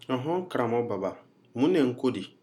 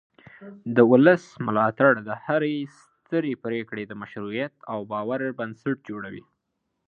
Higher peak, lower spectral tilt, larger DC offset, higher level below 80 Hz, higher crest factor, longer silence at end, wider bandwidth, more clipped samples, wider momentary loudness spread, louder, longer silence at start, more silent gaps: second, -12 dBFS vs -2 dBFS; about the same, -7 dB/octave vs -8 dB/octave; neither; second, -80 dBFS vs -70 dBFS; second, 16 dB vs 22 dB; second, 0.15 s vs 0.65 s; first, 12.5 kHz vs 7.4 kHz; neither; second, 9 LU vs 18 LU; second, -28 LUFS vs -24 LUFS; second, 0.1 s vs 0.4 s; neither